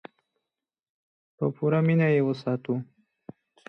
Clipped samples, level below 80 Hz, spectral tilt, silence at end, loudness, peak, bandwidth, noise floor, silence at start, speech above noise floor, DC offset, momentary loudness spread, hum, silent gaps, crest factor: under 0.1%; -72 dBFS; -10 dB/octave; 0.85 s; -26 LUFS; -12 dBFS; 6 kHz; -89 dBFS; 1.4 s; 65 dB; under 0.1%; 10 LU; none; none; 16 dB